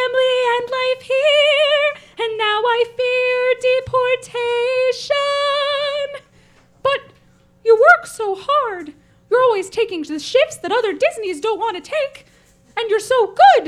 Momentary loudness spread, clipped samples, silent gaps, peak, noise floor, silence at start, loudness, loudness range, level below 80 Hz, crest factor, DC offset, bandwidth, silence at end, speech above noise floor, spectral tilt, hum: 11 LU; under 0.1%; none; 0 dBFS; -52 dBFS; 0 s; -17 LUFS; 4 LU; -58 dBFS; 18 dB; under 0.1%; 13.5 kHz; 0 s; 36 dB; -2 dB/octave; none